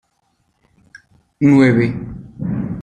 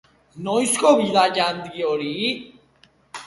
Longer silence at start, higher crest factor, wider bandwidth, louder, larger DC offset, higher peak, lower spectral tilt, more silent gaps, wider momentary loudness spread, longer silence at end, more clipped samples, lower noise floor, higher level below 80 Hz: first, 0.95 s vs 0.35 s; about the same, 16 dB vs 20 dB; second, 9 kHz vs 12 kHz; first, -15 LUFS vs -20 LUFS; neither; about the same, -2 dBFS vs -2 dBFS; first, -8.5 dB/octave vs -3 dB/octave; neither; first, 17 LU vs 14 LU; about the same, 0 s vs 0 s; neither; first, -65 dBFS vs -57 dBFS; first, -46 dBFS vs -64 dBFS